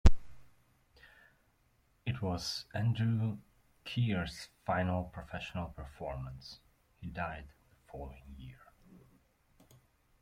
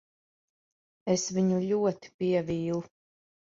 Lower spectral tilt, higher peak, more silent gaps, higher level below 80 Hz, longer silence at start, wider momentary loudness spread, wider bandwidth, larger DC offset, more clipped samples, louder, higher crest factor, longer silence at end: about the same, -6 dB/octave vs -6 dB/octave; about the same, -10 dBFS vs -12 dBFS; second, none vs 2.14-2.19 s; first, -42 dBFS vs -66 dBFS; second, 0.05 s vs 1.05 s; first, 19 LU vs 7 LU; first, 12 kHz vs 7.8 kHz; neither; neither; second, -38 LUFS vs -29 LUFS; first, 26 dB vs 18 dB; first, 1.65 s vs 0.7 s